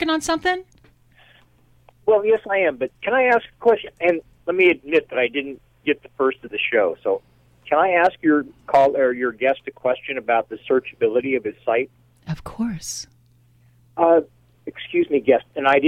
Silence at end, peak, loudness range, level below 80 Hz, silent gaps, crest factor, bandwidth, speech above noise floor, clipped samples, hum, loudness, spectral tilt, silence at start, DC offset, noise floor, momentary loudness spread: 0 s; -4 dBFS; 5 LU; -56 dBFS; none; 18 dB; 14 kHz; 36 dB; under 0.1%; none; -20 LUFS; -4.5 dB/octave; 0 s; under 0.1%; -56 dBFS; 12 LU